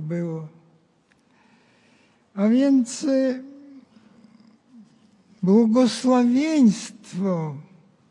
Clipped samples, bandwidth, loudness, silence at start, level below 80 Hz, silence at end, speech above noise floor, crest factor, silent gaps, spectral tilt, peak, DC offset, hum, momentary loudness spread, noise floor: under 0.1%; 11 kHz; -21 LUFS; 0 s; -76 dBFS; 0.5 s; 42 dB; 16 dB; none; -6.5 dB/octave; -8 dBFS; under 0.1%; none; 17 LU; -62 dBFS